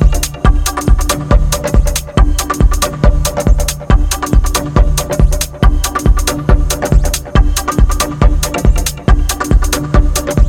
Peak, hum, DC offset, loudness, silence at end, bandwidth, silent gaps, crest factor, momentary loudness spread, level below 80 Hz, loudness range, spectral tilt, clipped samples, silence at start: 0 dBFS; none; under 0.1%; -13 LUFS; 0 s; 17 kHz; none; 10 dB; 1 LU; -12 dBFS; 0 LU; -4.5 dB/octave; under 0.1%; 0 s